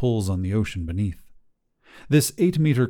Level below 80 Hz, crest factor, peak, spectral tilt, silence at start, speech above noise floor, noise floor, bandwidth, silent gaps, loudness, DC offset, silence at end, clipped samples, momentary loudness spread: -44 dBFS; 18 dB; -6 dBFS; -6 dB/octave; 0 s; 38 dB; -60 dBFS; 19 kHz; none; -23 LUFS; under 0.1%; 0 s; under 0.1%; 9 LU